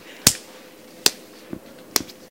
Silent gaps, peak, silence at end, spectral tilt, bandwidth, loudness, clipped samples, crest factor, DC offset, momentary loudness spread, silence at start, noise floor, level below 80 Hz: none; 0 dBFS; 0.2 s; -1 dB/octave; 17 kHz; -21 LUFS; under 0.1%; 26 dB; under 0.1%; 21 LU; 0.25 s; -44 dBFS; -50 dBFS